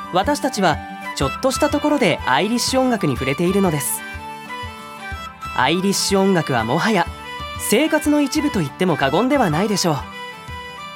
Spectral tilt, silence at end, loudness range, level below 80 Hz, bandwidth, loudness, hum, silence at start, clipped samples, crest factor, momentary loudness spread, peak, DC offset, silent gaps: -4.5 dB/octave; 0 s; 2 LU; -42 dBFS; 17.5 kHz; -18 LUFS; none; 0 s; under 0.1%; 18 dB; 14 LU; -2 dBFS; under 0.1%; none